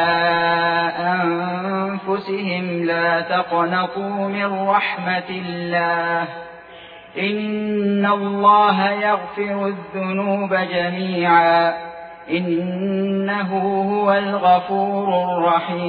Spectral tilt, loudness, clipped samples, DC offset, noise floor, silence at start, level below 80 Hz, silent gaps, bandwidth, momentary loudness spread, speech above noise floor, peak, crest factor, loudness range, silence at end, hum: -9 dB/octave; -19 LUFS; under 0.1%; under 0.1%; -40 dBFS; 0 s; -64 dBFS; none; 4.9 kHz; 9 LU; 21 dB; -2 dBFS; 18 dB; 3 LU; 0 s; none